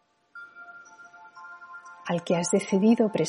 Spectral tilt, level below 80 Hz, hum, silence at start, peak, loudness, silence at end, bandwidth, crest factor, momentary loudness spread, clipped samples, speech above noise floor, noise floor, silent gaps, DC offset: -5.5 dB/octave; -76 dBFS; none; 0.35 s; -10 dBFS; -24 LUFS; 0 s; 11.5 kHz; 18 dB; 24 LU; under 0.1%; 27 dB; -50 dBFS; none; under 0.1%